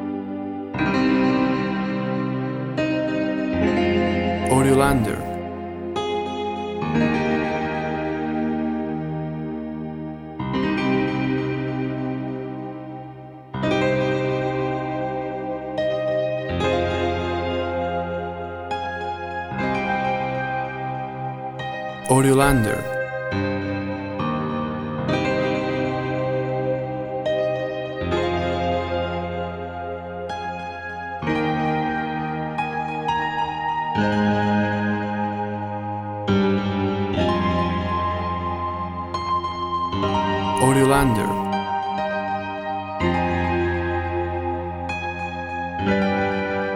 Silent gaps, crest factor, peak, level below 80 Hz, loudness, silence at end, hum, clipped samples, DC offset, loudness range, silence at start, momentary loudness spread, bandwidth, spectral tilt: none; 20 dB; -2 dBFS; -44 dBFS; -23 LUFS; 0 s; none; under 0.1%; under 0.1%; 5 LU; 0 s; 9 LU; 16 kHz; -6 dB/octave